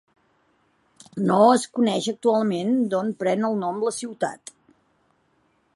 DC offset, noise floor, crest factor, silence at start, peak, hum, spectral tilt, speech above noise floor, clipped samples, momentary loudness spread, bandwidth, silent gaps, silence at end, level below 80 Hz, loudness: under 0.1%; -66 dBFS; 20 dB; 1.15 s; -4 dBFS; none; -5.5 dB/octave; 44 dB; under 0.1%; 12 LU; 11.5 kHz; none; 1.4 s; -74 dBFS; -22 LUFS